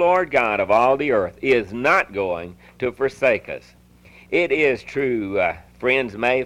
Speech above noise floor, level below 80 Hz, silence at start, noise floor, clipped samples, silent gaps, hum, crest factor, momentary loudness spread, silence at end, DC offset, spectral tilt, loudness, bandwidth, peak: 28 dB; -52 dBFS; 0 s; -49 dBFS; under 0.1%; none; none; 14 dB; 10 LU; 0 s; under 0.1%; -5.5 dB/octave; -20 LUFS; 13 kHz; -6 dBFS